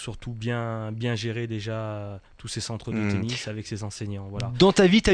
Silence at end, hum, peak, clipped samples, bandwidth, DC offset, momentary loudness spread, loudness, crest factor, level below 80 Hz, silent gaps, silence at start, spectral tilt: 0 s; none; -6 dBFS; under 0.1%; 10.5 kHz; under 0.1%; 16 LU; -26 LUFS; 18 dB; -46 dBFS; none; 0 s; -5.5 dB/octave